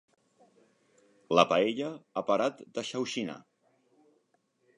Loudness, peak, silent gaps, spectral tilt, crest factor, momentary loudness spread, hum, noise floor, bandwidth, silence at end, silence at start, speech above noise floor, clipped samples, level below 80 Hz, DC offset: -30 LUFS; -8 dBFS; none; -4.5 dB/octave; 24 dB; 13 LU; none; -74 dBFS; 11 kHz; 1.35 s; 1.3 s; 44 dB; under 0.1%; -74 dBFS; under 0.1%